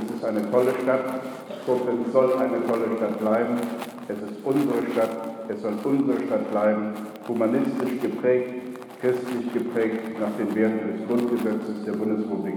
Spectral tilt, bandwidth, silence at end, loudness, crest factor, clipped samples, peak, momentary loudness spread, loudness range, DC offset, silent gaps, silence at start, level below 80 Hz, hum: -7 dB/octave; 20 kHz; 0 s; -25 LUFS; 18 dB; under 0.1%; -8 dBFS; 10 LU; 2 LU; under 0.1%; none; 0 s; -76 dBFS; none